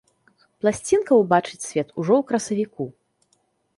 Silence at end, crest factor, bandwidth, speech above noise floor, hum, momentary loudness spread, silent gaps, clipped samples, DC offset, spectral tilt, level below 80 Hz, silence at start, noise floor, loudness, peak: 0.85 s; 20 dB; 11.5 kHz; 47 dB; none; 11 LU; none; under 0.1%; under 0.1%; -5.5 dB/octave; -60 dBFS; 0.65 s; -68 dBFS; -22 LUFS; -4 dBFS